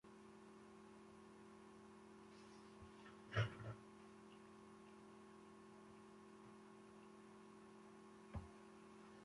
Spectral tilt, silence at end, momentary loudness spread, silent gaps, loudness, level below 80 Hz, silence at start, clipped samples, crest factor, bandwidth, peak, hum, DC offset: -6 dB/octave; 0 s; 12 LU; none; -57 LUFS; -72 dBFS; 0.05 s; under 0.1%; 28 dB; 11.5 kHz; -30 dBFS; 60 Hz at -80 dBFS; under 0.1%